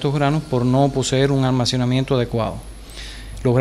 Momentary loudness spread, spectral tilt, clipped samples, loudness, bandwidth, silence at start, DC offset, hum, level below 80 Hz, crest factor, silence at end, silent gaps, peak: 17 LU; -6 dB/octave; under 0.1%; -19 LUFS; 12.5 kHz; 0 s; under 0.1%; none; -38 dBFS; 14 dB; 0 s; none; -4 dBFS